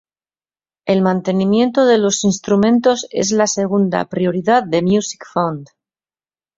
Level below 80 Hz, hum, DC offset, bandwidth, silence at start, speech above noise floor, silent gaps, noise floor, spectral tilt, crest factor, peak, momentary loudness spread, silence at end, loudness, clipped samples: -56 dBFS; none; under 0.1%; 7.8 kHz; 0.85 s; over 75 dB; none; under -90 dBFS; -5 dB/octave; 14 dB; -2 dBFS; 7 LU; 0.9 s; -16 LUFS; under 0.1%